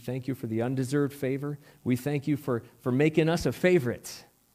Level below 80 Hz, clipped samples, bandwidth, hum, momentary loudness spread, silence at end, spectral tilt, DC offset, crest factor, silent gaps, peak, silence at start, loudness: -56 dBFS; under 0.1%; 16 kHz; none; 12 LU; 0.35 s; -6.5 dB/octave; under 0.1%; 18 dB; none; -10 dBFS; 0 s; -28 LUFS